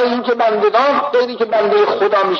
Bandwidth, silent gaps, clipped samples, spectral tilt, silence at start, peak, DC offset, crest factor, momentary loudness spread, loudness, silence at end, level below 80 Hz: 6.6 kHz; none; under 0.1%; -5 dB/octave; 0 s; -2 dBFS; under 0.1%; 12 dB; 3 LU; -14 LUFS; 0 s; -66 dBFS